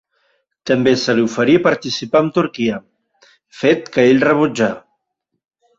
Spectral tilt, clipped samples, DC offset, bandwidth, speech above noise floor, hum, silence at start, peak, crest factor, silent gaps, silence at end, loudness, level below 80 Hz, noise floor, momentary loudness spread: -5.5 dB/octave; under 0.1%; under 0.1%; 7.8 kHz; 60 dB; none; 0.65 s; -2 dBFS; 16 dB; none; 1 s; -15 LUFS; -56 dBFS; -75 dBFS; 8 LU